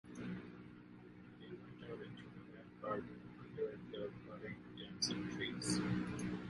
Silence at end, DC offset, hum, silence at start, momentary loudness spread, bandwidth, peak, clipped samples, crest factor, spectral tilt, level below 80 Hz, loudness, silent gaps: 0 s; under 0.1%; none; 0.05 s; 18 LU; 11.5 kHz; -26 dBFS; under 0.1%; 20 dB; -4.5 dB/octave; -68 dBFS; -45 LUFS; none